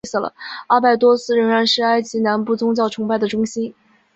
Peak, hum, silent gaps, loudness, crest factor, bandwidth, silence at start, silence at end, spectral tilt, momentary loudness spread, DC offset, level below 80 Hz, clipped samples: -2 dBFS; none; none; -17 LUFS; 16 dB; 8 kHz; 0.05 s; 0.45 s; -4.5 dB/octave; 10 LU; under 0.1%; -62 dBFS; under 0.1%